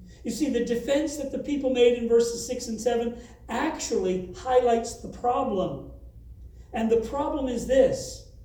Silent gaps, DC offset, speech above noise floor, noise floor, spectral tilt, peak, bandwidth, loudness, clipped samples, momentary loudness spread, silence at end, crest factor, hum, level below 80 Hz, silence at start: none; under 0.1%; 20 dB; -45 dBFS; -4.5 dB/octave; -8 dBFS; over 20 kHz; -26 LUFS; under 0.1%; 12 LU; 0 s; 18 dB; none; -48 dBFS; 0 s